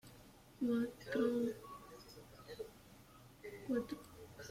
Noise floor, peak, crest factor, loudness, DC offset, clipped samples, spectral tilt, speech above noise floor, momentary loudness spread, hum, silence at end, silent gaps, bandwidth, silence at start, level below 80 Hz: -61 dBFS; -26 dBFS; 18 dB; -41 LUFS; under 0.1%; under 0.1%; -6 dB/octave; 23 dB; 24 LU; none; 0 s; none; 16.5 kHz; 0.05 s; -70 dBFS